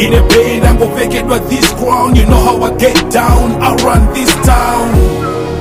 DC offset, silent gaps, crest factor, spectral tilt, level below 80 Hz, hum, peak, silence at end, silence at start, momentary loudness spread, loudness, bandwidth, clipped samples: under 0.1%; none; 8 dB; -5 dB/octave; -14 dBFS; none; 0 dBFS; 0 s; 0 s; 5 LU; -10 LUFS; 16.5 kHz; 0.3%